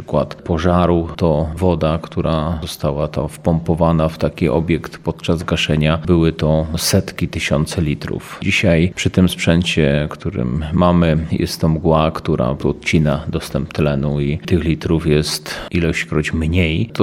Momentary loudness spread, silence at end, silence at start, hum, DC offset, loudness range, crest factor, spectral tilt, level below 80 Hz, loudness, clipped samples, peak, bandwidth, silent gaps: 7 LU; 0 s; 0 s; none; under 0.1%; 2 LU; 16 dB; -6 dB/octave; -32 dBFS; -17 LUFS; under 0.1%; 0 dBFS; 16 kHz; none